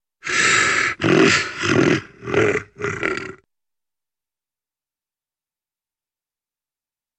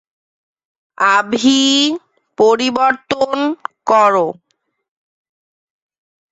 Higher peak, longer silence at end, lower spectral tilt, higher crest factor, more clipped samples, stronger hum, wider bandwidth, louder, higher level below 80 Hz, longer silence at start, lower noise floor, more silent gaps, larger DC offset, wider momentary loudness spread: about the same, -2 dBFS vs -2 dBFS; first, 3.85 s vs 2 s; about the same, -3.5 dB/octave vs -2.5 dB/octave; about the same, 20 dB vs 16 dB; neither; neither; first, 11 kHz vs 8 kHz; second, -18 LUFS vs -14 LUFS; first, -56 dBFS vs -62 dBFS; second, 0.25 s vs 1 s; first, under -90 dBFS vs -68 dBFS; neither; neither; about the same, 10 LU vs 9 LU